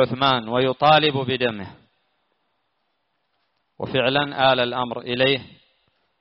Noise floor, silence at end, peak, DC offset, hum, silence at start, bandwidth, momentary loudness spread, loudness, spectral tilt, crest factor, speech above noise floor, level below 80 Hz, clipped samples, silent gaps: -73 dBFS; 0.75 s; -4 dBFS; under 0.1%; none; 0 s; 5.8 kHz; 11 LU; -20 LUFS; -2.5 dB/octave; 18 dB; 52 dB; -58 dBFS; under 0.1%; none